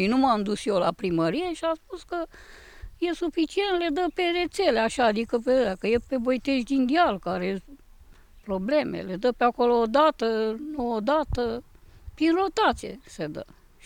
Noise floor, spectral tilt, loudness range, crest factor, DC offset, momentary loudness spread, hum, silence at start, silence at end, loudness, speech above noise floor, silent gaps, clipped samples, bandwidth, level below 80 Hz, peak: -51 dBFS; -5.5 dB/octave; 4 LU; 16 dB; under 0.1%; 12 LU; none; 0 s; 0.4 s; -25 LUFS; 26 dB; none; under 0.1%; 16.5 kHz; -48 dBFS; -10 dBFS